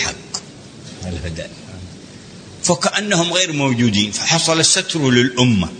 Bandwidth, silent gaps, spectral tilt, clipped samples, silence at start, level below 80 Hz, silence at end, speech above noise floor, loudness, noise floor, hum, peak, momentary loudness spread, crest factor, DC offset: 9.6 kHz; none; -3.5 dB/octave; under 0.1%; 0 s; -44 dBFS; 0 s; 21 dB; -15 LUFS; -37 dBFS; none; 0 dBFS; 23 LU; 18 dB; under 0.1%